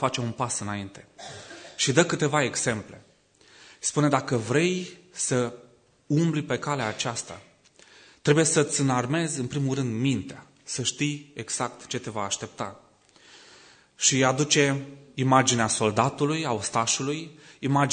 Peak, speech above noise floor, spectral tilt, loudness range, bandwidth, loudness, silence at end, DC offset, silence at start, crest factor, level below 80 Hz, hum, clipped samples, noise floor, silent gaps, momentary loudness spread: -4 dBFS; 33 dB; -4 dB/octave; 6 LU; 9.6 kHz; -25 LUFS; 0 s; under 0.1%; 0 s; 22 dB; -66 dBFS; none; under 0.1%; -58 dBFS; none; 16 LU